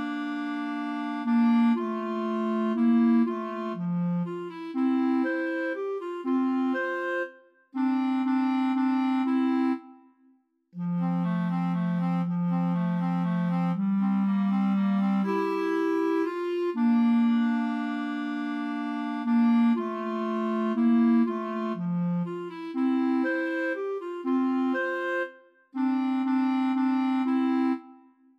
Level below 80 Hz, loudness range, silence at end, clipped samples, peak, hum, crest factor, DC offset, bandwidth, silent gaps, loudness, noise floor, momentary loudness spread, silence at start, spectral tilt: -84 dBFS; 3 LU; 0.45 s; under 0.1%; -14 dBFS; none; 12 dB; under 0.1%; 6.6 kHz; none; -27 LUFS; -64 dBFS; 9 LU; 0 s; -9 dB/octave